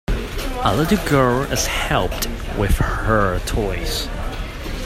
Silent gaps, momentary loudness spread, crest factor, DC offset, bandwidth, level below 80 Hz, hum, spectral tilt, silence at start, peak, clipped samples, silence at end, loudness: none; 10 LU; 18 dB; under 0.1%; 16 kHz; -26 dBFS; none; -4.5 dB/octave; 0.1 s; 0 dBFS; under 0.1%; 0 s; -20 LUFS